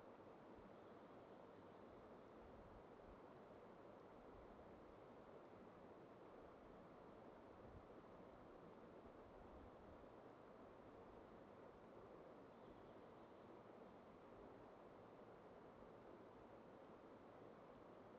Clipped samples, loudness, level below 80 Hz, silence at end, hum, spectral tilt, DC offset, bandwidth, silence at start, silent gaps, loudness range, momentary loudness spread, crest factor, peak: under 0.1%; -64 LUFS; -78 dBFS; 0 s; none; -6 dB/octave; under 0.1%; 6.2 kHz; 0 s; none; 0 LU; 1 LU; 14 dB; -48 dBFS